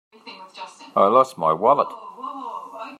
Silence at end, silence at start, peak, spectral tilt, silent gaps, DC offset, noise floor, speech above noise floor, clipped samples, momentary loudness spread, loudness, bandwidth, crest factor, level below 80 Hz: 0.05 s; 0.25 s; -2 dBFS; -6 dB/octave; none; under 0.1%; -41 dBFS; 23 dB; under 0.1%; 22 LU; -19 LUFS; 13 kHz; 20 dB; -76 dBFS